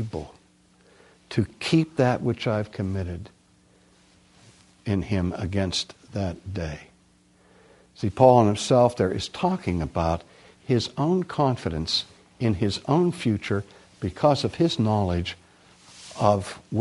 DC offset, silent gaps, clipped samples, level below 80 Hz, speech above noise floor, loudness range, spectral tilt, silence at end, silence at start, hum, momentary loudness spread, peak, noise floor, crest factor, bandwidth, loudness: under 0.1%; none; under 0.1%; -48 dBFS; 36 dB; 8 LU; -6 dB/octave; 0 s; 0 s; none; 14 LU; -2 dBFS; -59 dBFS; 22 dB; 11.5 kHz; -25 LUFS